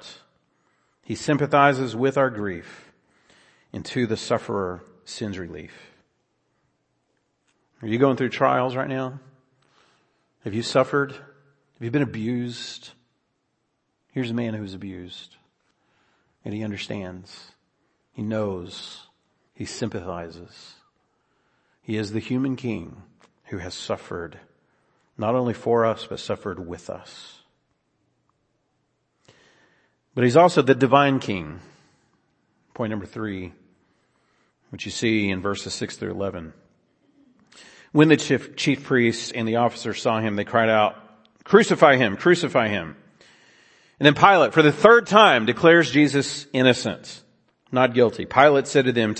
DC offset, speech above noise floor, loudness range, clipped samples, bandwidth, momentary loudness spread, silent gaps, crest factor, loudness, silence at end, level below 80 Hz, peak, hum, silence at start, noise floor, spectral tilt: under 0.1%; 52 dB; 17 LU; under 0.1%; 8.8 kHz; 21 LU; none; 24 dB; -21 LUFS; 0 s; -62 dBFS; 0 dBFS; none; 0.05 s; -74 dBFS; -5.5 dB/octave